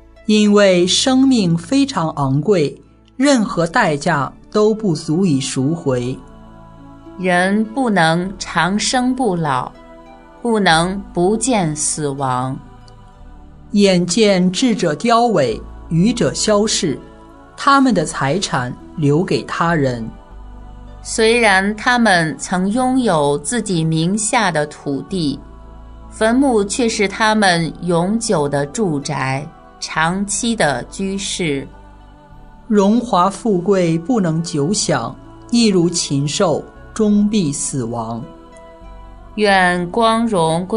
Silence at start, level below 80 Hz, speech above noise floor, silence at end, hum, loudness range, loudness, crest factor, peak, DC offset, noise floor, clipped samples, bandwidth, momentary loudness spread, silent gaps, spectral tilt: 0.3 s; -42 dBFS; 25 dB; 0 s; none; 4 LU; -16 LUFS; 16 dB; 0 dBFS; under 0.1%; -41 dBFS; under 0.1%; 11 kHz; 10 LU; none; -4.5 dB/octave